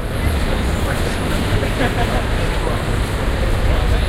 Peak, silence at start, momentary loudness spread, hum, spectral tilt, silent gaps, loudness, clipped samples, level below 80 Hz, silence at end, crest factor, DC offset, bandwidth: -4 dBFS; 0 s; 2 LU; none; -5.5 dB/octave; none; -19 LUFS; under 0.1%; -20 dBFS; 0 s; 14 dB; under 0.1%; 16 kHz